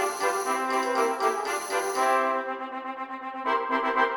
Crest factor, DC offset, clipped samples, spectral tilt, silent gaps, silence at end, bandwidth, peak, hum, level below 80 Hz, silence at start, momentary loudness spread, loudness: 18 dB; under 0.1%; under 0.1%; -1 dB/octave; none; 0 s; 19 kHz; -10 dBFS; none; -74 dBFS; 0 s; 11 LU; -27 LUFS